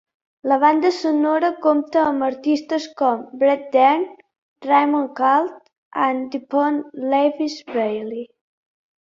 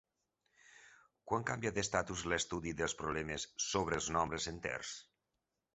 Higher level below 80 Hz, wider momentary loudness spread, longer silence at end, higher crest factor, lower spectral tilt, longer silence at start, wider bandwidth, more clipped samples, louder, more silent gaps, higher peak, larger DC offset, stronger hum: second, -68 dBFS vs -58 dBFS; first, 12 LU vs 6 LU; about the same, 0.8 s vs 0.75 s; second, 18 dB vs 24 dB; first, -4.5 dB/octave vs -3 dB/octave; second, 0.45 s vs 0.7 s; about the same, 7.6 kHz vs 8.2 kHz; neither; first, -19 LUFS vs -38 LUFS; first, 4.38-4.56 s, 5.78-5.91 s vs none; first, -2 dBFS vs -16 dBFS; neither; neither